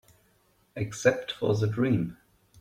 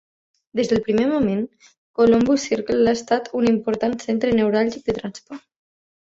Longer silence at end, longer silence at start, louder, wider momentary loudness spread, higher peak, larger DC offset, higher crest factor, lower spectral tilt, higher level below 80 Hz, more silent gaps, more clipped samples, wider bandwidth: second, 0.45 s vs 0.75 s; first, 0.75 s vs 0.55 s; second, -28 LUFS vs -20 LUFS; second, 11 LU vs 15 LU; second, -8 dBFS vs -4 dBFS; neither; about the same, 20 dB vs 16 dB; about the same, -6 dB/octave vs -5.5 dB/octave; second, -60 dBFS vs -52 dBFS; second, none vs 1.78-1.94 s; neither; first, 14.5 kHz vs 7.8 kHz